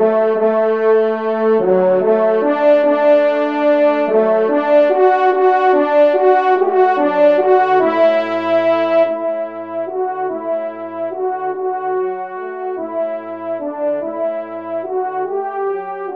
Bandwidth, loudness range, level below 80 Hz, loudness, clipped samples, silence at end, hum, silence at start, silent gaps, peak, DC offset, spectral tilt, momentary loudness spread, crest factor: 6 kHz; 9 LU; -70 dBFS; -15 LUFS; under 0.1%; 0 s; none; 0 s; none; -2 dBFS; 0.3%; -7.5 dB/octave; 11 LU; 14 dB